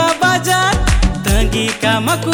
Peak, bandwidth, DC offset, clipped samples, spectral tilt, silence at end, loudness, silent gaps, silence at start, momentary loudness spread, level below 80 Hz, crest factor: 0 dBFS; 19.5 kHz; under 0.1%; under 0.1%; -4 dB/octave; 0 s; -14 LUFS; none; 0 s; 3 LU; -20 dBFS; 14 dB